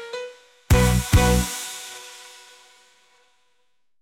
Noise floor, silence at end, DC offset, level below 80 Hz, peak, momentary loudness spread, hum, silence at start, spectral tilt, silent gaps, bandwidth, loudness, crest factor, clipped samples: -73 dBFS; 1.8 s; under 0.1%; -30 dBFS; -6 dBFS; 22 LU; none; 0 s; -5 dB/octave; none; 18 kHz; -21 LUFS; 18 dB; under 0.1%